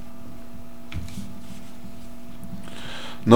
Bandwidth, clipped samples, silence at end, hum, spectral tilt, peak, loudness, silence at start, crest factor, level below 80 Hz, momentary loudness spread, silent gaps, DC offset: 17 kHz; under 0.1%; 0 s; none; -6.5 dB/octave; 0 dBFS; -38 LUFS; 0 s; 26 dB; -46 dBFS; 8 LU; none; 3%